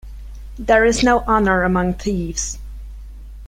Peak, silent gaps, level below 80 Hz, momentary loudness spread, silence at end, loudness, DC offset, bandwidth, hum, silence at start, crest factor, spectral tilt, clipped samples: -2 dBFS; none; -32 dBFS; 23 LU; 0 s; -17 LUFS; under 0.1%; 15.5 kHz; none; 0.05 s; 18 dB; -4.5 dB/octave; under 0.1%